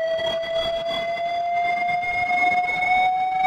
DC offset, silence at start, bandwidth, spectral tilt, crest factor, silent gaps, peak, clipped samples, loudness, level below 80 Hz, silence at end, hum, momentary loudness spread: under 0.1%; 0 s; 10 kHz; -3 dB/octave; 12 dB; none; -10 dBFS; under 0.1%; -22 LUFS; -52 dBFS; 0 s; none; 6 LU